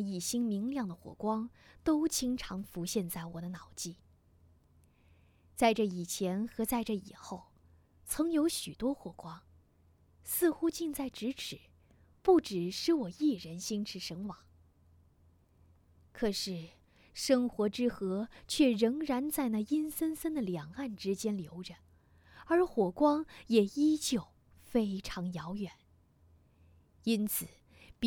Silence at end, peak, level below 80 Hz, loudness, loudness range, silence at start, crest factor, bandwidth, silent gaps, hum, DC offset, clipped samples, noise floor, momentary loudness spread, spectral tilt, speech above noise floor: 0 s; -12 dBFS; -62 dBFS; -34 LUFS; 6 LU; 0 s; 22 dB; 19.5 kHz; none; none; under 0.1%; under 0.1%; -66 dBFS; 15 LU; -4.5 dB/octave; 33 dB